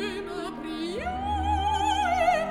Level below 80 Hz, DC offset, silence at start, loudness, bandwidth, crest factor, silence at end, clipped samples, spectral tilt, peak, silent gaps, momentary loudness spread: -40 dBFS; under 0.1%; 0 s; -27 LUFS; 15 kHz; 16 dB; 0 s; under 0.1%; -5 dB/octave; -12 dBFS; none; 11 LU